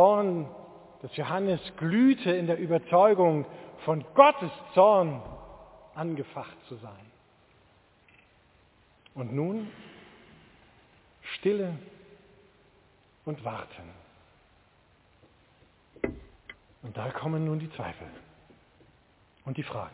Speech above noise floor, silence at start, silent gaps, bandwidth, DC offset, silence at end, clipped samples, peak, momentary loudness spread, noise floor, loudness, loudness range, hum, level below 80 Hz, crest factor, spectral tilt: 36 dB; 0 s; none; 4 kHz; under 0.1%; 0.05 s; under 0.1%; -4 dBFS; 27 LU; -63 dBFS; -27 LUFS; 21 LU; none; -62 dBFS; 26 dB; -10.5 dB/octave